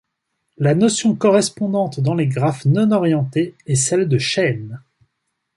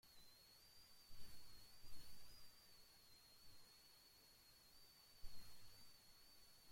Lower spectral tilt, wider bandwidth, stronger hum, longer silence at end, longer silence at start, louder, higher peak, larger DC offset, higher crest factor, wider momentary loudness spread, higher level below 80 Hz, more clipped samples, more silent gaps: first, -5.5 dB/octave vs -2 dB/octave; second, 11.5 kHz vs 16.5 kHz; neither; first, 0.8 s vs 0 s; first, 0.6 s vs 0.05 s; first, -18 LUFS vs -66 LUFS; first, -2 dBFS vs -40 dBFS; neither; about the same, 16 dB vs 16 dB; first, 6 LU vs 3 LU; first, -58 dBFS vs -70 dBFS; neither; neither